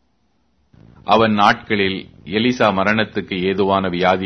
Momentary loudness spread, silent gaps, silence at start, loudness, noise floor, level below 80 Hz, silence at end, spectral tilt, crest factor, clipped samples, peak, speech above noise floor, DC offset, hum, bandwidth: 8 LU; none; 1.05 s; -17 LUFS; -64 dBFS; -50 dBFS; 0 s; -6 dB/octave; 18 dB; under 0.1%; 0 dBFS; 48 dB; under 0.1%; none; 6.6 kHz